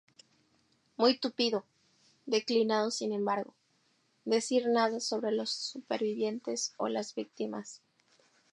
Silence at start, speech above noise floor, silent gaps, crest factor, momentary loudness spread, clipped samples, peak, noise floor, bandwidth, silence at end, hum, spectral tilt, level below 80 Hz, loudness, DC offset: 1 s; 41 dB; none; 22 dB; 11 LU; under 0.1%; -12 dBFS; -72 dBFS; 11.5 kHz; 0.75 s; none; -3 dB/octave; -88 dBFS; -32 LUFS; under 0.1%